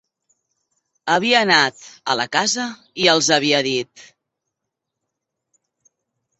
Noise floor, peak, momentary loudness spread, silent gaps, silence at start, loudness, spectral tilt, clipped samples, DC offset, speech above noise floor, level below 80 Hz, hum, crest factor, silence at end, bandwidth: -81 dBFS; 0 dBFS; 14 LU; none; 1.05 s; -17 LUFS; -2 dB/octave; under 0.1%; under 0.1%; 63 dB; -66 dBFS; none; 22 dB; 2.4 s; 8.4 kHz